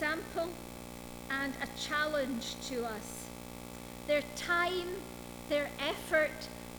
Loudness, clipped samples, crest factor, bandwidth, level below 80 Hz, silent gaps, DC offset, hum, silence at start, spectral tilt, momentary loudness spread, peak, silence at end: -35 LUFS; under 0.1%; 18 dB; over 20 kHz; -56 dBFS; none; under 0.1%; 60 Hz at -55 dBFS; 0 s; -3.5 dB/octave; 15 LU; -18 dBFS; 0 s